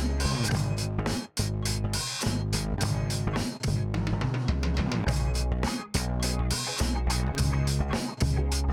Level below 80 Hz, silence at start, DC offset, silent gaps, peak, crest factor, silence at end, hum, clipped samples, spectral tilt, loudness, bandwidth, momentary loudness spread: -32 dBFS; 0 s; under 0.1%; none; -14 dBFS; 14 dB; 0 s; none; under 0.1%; -5 dB/octave; -29 LUFS; 17 kHz; 3 LU